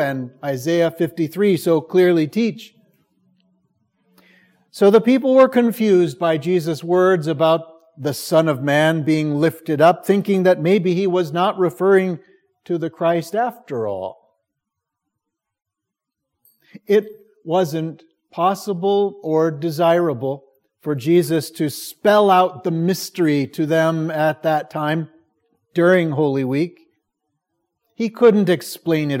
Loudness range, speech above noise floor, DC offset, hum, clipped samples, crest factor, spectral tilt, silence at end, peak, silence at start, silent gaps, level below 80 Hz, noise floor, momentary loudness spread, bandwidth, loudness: 8 LU; 65 dB; under 0.1%; none; under 0.1%; 18 dB; -6.5 dB/octave; 0 s; 0 dBFS; 0 s; none; -70 dBFS; -82 dBFS; 12 LU; 16.5 kHz; -18 LUFS